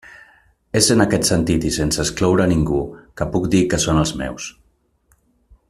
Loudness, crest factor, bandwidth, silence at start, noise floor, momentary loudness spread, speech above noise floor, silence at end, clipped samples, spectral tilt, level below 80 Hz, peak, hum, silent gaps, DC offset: -18 LUFS; 20 dB; 15 kHz; 0.05 s; -62 dBFS; 12 LU; 44 dB; 1.2 s; under 0.1%; -4.5 dB/octave; -36 dBFS; 0 dBFS; none; none; under 0.1%